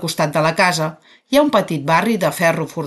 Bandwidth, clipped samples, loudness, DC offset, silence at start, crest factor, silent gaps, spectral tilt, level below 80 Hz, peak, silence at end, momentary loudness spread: 12.5 kHz; under 0.1%; -17 LUFS; under 0.1%; 0 s; 14 dB; none; -4.5 dB/octave; -56 dBFS; -2 dBFS; 0 s; 4 LU